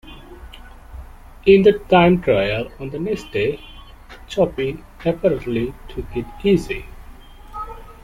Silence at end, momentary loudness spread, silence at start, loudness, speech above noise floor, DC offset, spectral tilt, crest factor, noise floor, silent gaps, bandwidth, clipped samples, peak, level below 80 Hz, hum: 0.1 s; 25 LU; 0.05 s; -19 LUFS; 22 dB; under 0.1%; -7 dB/octave; 18 dB; -40 dBFS; none; 14 kHz; under 0.1%; -2 dBFS; -38 dBFS; none